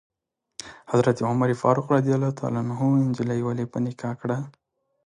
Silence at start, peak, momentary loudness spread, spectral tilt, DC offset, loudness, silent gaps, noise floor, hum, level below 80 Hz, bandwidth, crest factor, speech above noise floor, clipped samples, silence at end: 0.6 s; -6 dBFS; 16 LU; -8 dB/octave; under 0.1%; -24 LUFS; none; -46 dBFS; none; -64 dBFS; 10.5 kHz; 20 dB; 23 dB; under 0.1%; 0.55 s